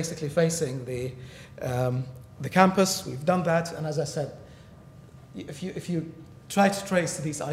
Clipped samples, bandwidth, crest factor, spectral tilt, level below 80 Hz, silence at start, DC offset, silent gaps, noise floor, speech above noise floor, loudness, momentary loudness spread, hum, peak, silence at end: under 0.1%; 16 kHz; 24 dB; -5 dB/octave; -58 dBFS; 0 s; under 0.1%; none; -49 dBFS; 22 dB; -27 LUFS; 19 LU; none; -4 dBFS; 0 s